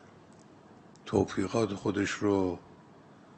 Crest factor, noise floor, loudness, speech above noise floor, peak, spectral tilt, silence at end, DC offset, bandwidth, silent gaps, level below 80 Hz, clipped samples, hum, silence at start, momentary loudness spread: 20 dB; -55 dBFS; -30 LUFS; 26 dB; -14 dBFS; -6 dB/octave; 0.6 s; under 0.1%; 8.8 kHz; none; -62 dBFS; under 0.1%; none; 0.7 s; 8 LU